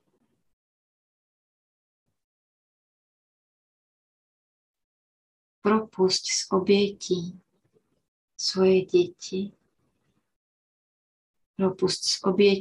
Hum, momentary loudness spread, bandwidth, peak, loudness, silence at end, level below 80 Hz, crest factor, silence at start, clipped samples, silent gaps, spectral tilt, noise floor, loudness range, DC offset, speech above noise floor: none; 12 LU; 11.5 kHz; -8 dBFS; -25 LUFS; 0 s; -68 dBFS; 20 dB; 5.65 s; under 0.1%; 8.08-8.28 s, 10.36-11.34 s, 11.46-11.54 s; -4.5 dB/octave; -74 dBFS; 6 LU; under 0.1%; 50 dB